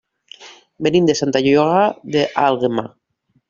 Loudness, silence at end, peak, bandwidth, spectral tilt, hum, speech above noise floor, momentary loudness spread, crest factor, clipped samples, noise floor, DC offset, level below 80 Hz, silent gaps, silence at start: -17 LUFS; 0.6 s; 0 dBFS; 7.6 kHz; -5.5 dB/octave; none; 48 dB; 8 LU; 18 dB; under 0.1%; -64 dBFS; under 0.1%; -56 dBFS; none; 0.4 s